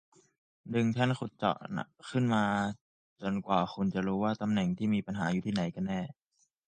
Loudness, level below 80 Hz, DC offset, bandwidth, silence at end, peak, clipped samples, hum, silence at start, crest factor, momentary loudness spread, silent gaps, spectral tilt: -32 LUFS; -64 dBFS; under 0.1%; 9.2 kHz; 0.55 s; -12 dBFS; under 0.1%; none; 0.65 s; 20 dB; 9 LU; 2.81-3.16 s; -7 dB/octave